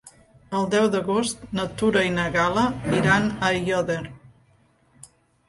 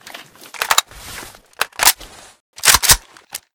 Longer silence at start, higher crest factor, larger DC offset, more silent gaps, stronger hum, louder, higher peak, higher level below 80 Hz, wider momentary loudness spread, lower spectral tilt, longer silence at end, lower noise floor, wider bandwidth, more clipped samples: about the same, 0.05 s vs 0.15 s; about the same, 18 dB vs 20 dB; neither; second, none vs 2.41-2.53 s; neither; second, -23 LUFS vs -14 LUFS; second, -6 dBFS vs 0 dBFS; second, -50 dBFS vs -38 dBFS; second, 9 LU vs 23 LU; first, -5 dB/octave vs 0.5 dB/octave; first, 1.2 s vs 0.2 s; first, -60 dBFS vs -38 dBFS; second, 11.5 kHz vs over 20 kHz; second, under 0.1% vs 0.3%